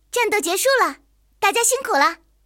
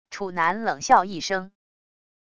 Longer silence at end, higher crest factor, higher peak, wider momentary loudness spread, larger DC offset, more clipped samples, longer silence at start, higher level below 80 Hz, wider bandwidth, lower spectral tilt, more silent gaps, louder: second, 0.3 s vs 0.7 s; about the same, 18 dB vs 20 dB; about the same, -4 dBFS vs -4 dBFS; second, 4 LU vs 10 LU; neither; neither; about the same, 0.15 s vs 0.05 s; about the same, -60 dBFS vs -60 dBFS; first, 17.5 kHz vs 10 kHz; second, 0.5 dB/octave vs -3 dB/octave; neither; first, -18 LUFS vs -23 LUFS